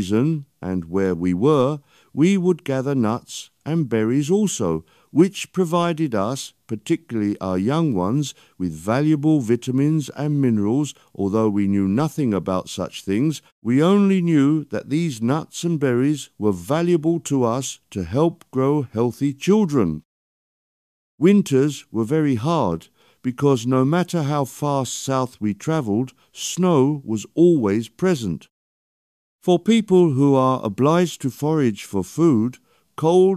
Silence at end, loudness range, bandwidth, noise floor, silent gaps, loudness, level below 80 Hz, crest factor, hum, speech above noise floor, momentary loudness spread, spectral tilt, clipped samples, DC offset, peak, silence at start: 0 s; 3 LU; 14.5 kHz; under -90 dBFS; 13.52-13.62 s, 20.05-21.18 s, 28.51-29.39 s; -20 LUFS; -56 dBFS; 16 dB; none; over 70 dB; 11 LU; -6.5 dB/octave; under 0.1%; under 0.1%; -4 dBFS; 0 s